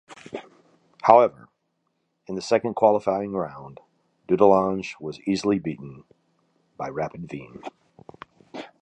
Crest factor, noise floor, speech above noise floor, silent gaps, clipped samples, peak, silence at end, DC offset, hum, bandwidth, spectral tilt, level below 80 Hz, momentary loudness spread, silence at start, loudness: 24 dB; -74 dBFS; 52 dB; none; under 0.1%; 0 dBFS; 0.15 s; under 0.1%; none; 9.2 kHz; -6.5 dB/octave; -62 dBFS; 23 LU; 0.1 s; -22 LUFS